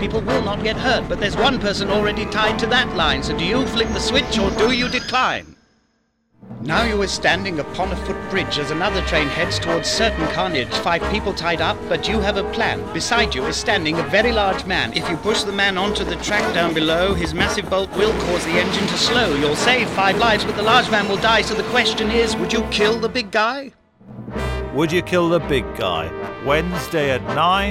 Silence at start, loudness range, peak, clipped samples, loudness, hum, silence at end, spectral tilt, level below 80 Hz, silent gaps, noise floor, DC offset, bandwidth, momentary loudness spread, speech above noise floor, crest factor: 0 s; 4 LU; -2 dBFS; under 0.1%; -19 LUFS; none; 0 s; -4 dB/octave; -34 dBFS; none; -65 dBFS; 0.2%; 16 kHz; 6 LU; 46 dB; 16 dB